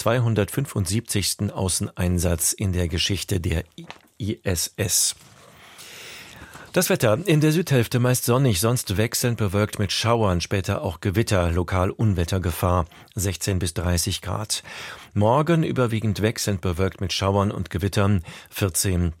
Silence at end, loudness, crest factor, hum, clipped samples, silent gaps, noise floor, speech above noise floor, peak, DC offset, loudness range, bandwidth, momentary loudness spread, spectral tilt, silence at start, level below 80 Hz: 0.05 s; -23 LUFS; 18 dB; none; under 0.1%; none; -47 dBFS; 24 dB; -6 dBFS; under 0.1%; 4 LU; 16.5 kHz; 11 LU; -4.5 dB/octave; 0 s; -42 dBFS